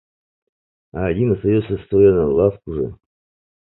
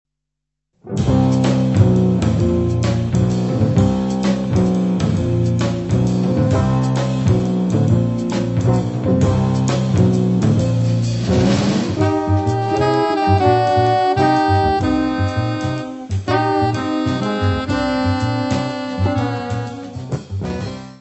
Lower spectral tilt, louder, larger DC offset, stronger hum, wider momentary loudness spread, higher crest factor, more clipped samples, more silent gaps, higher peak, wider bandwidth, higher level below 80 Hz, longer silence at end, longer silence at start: first, -13.5 dB/octave vs -7.5 dB/octave; about the same, -18 LUFS vs -17 LUFS; neither; neither; first, 12 LU vs 7 LU; about the same, 18 dB vs 16 dB; neither; neither; about the same, -2 dBFS vs 0 dBFS; second, 4.1 kHz vs 8.4 kHz; about the same, -40 dBFS vs -36 dBFS; first, 0.7 s vs 0.05 s; about the same, 0.95 s vs 0.85 s